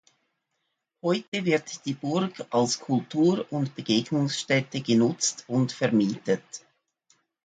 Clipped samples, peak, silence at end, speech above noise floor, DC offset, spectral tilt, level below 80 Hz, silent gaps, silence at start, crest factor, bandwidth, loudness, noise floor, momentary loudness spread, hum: under 0.1%; -8 dBFS; 0.85 s; 53 dB; under 0.1%; -4.5 dB/octave; -70 dBFS; 1.28-1.32 s; 1.05 s; 18 dB; 9.4 kHz; -26 LUFS; -79 dBFS; 7 LU; none